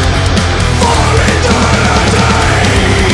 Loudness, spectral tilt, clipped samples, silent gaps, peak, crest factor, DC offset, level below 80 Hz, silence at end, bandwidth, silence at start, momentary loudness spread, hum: -9 LUFS; -4.5 dB/octave; under 0.1%; none; 0 dBFS; 8 dB; under 0.1%; -18 dBFS; 0 s; 12 kHz; 0 s; 2 LU; none